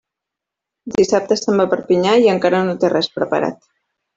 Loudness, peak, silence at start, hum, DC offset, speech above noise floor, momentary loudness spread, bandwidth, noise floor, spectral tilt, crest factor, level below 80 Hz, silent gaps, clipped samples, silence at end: -16 LUFS; -2 dBFS; 0.85 s; none; under 0.1%; 68 dB; 7 LU; 7.8 kHz; -83 dBFS; -5 dB/octave; 16 dB; -56 dBFS; none; under 0.1%; 0.6 s